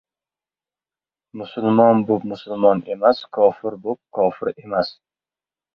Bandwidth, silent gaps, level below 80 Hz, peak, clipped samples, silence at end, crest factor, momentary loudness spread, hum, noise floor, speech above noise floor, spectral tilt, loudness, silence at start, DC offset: 5.8 kHz; none; -62 dBFS; -2 dBFS; under 0.1%; 0.85 s; 20 dB; 13 LU; none; under -90 dBFS; over 71 dB; -9 dB/octave; -19 LUFS; 1.35 s; under 0.1%